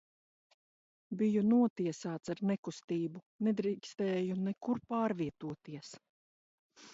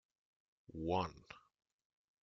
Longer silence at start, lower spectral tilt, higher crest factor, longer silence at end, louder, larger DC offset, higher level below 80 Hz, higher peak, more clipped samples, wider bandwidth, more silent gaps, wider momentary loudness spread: first, 1.1 s vs 0.7 s; first, -7 dB/octave vs -5 dB/octave; second, 16 dB vs 24 dB; second, 0 s vs 0.85 s; first, -35 LUFS vs -41 LUFS; neither; second, -76 dBFS vs -68 dBFS; about the same, -20 dBFS vs -22 dBFS; neither; about the same, 8 kHz vs 7.6 kHz; first, 1.70-1.76 s, 2.58-2.63 s, 2.84-2.88 s, 3.26-3.39 s, 6.09-6.70 s vs none; second, 16 LU vs 20 LU